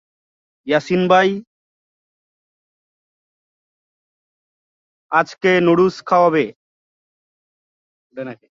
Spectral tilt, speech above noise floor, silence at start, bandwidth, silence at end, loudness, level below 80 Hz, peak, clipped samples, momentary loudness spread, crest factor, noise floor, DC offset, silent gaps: -6.5 dB/octave; over 74 dB; 0.65 s; 7.6 kHz; 0.2 s; -16 LUFS; -64 dBFS; -2 dBFS; under 0.1%; 18 LU; 20 dB; under -90 dBFS; under 0.1%; 1.47-5.09 s, 6.56-8.10 s